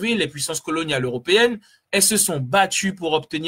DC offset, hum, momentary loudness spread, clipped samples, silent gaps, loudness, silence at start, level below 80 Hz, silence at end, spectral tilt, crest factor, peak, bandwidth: under 0.1%; none; 8 LU; under 0.1%; none; -19 LUFS; 0 s; -58 dBFS; 0 s; -2.5 dB/octave; 18 dB; -4 dBFS; 16.5 kHz